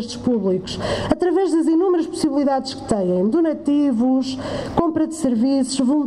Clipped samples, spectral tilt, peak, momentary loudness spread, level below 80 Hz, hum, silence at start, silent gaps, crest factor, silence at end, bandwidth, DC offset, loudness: under 0.1%; -6 dB/octave; -2 dBFS; 6 LU; -46 dBFS; none; 0 s; none; 18 dB; 0 s; 11.5 kHz; under 0.1%; -19 LUFS